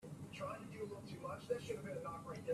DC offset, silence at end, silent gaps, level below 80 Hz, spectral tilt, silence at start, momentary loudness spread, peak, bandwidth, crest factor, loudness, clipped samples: under 0.1%; 0 s; none; -72 dBFS; -6 dB/octave; 0 s; 5 LU; -28 dBFS; 14.5 kHz; 18 dB; -47 LUFS; under 0.1%